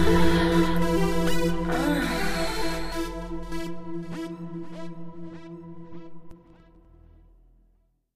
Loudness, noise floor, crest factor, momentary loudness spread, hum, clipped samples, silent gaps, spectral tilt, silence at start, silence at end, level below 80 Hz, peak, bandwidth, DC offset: -27 LUFS; -65 dBFS; 18 dB; 21 LU; none; under 0.1%; none; -5.5 dB/octave; 0 s; 1.8 s; -38 dBFS; -8 dBFS; 15.5 kHz; under 0.1%